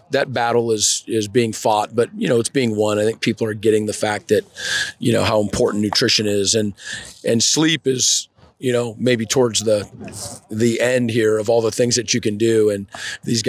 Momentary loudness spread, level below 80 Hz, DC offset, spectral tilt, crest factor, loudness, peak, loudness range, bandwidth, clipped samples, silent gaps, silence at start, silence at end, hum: 10 LU; -50 dBFS; under 0.1%; -3.5 dB/octave; 14 dB; -18 LUFS; -4 dBFS; 2 LU; 16 kHz; under 0.1%; none; 0.1 s; 0 s; none